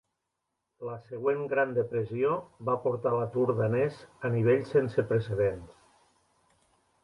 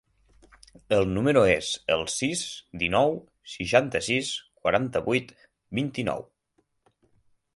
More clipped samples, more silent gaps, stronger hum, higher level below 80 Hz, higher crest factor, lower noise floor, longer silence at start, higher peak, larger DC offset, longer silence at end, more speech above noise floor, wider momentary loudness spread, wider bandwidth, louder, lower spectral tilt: neither; neither; neither; second, -62 dBFS vs -52 dBFS; second, 16 dB vs 22 dB; first, -83 dBFS vs -72 dBFS; about the same, 0.8 s vs 0.9 s; second, -14 dBFS vs -6 dBFS; neither; about the same, 1.3 s vs 1.35 s; first, 55 dB vs 47 dB; about the same, 11 LU vs 12 LU; about the same, 11 kHz vs 11.5 kHz; second, -29 LUFS vs -26 LUFS; first, -9 dB/octave vs -4 dB/octave